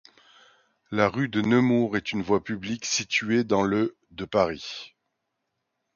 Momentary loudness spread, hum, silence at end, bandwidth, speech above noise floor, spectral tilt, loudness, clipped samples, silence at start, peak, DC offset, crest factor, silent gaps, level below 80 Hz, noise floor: 11 LU; none; 1.1 s; 7.2 kHz; 55 dB; -4.5 dB/octave; -25 LUFS; under 0.1%; 0.9 s; -6 dBFS; under 0.1%; 22 dB; none; -58 dBFS; -80 dBFS